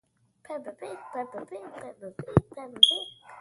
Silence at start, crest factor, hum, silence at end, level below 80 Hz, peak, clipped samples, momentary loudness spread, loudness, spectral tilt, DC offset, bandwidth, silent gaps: 0.5 s; 30 dB; none; 0 s; -52 dBFS; 0 dBFS; under 0.1%; 23 LU; -23 LUFS; -5 dB/octave; under 0.1%; 11.5 kHz; none